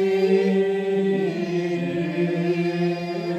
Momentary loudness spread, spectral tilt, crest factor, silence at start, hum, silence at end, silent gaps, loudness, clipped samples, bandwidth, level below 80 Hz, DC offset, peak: 6 LU; -7.5 dB/octave; 14 dB; 0 s; none; 0 s; none; -23 LUFS; under 0.1%; 8.8 kHz; -70 dBFS; under 0.1%; -8 dBFS